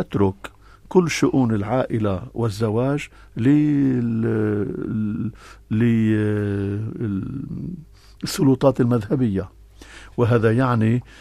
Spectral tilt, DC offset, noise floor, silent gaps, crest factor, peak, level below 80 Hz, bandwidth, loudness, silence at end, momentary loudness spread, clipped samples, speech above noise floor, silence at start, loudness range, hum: -7.5 dB/octave; under 0.1%; -43 dBFS; none; 20 dB; -2 dBFS; -48 dBFS; 14.5 kHz; -21 LUFS; 0.2 s; 13 LU; under 0.1%; 23 dB; 0 s; 3 LU; none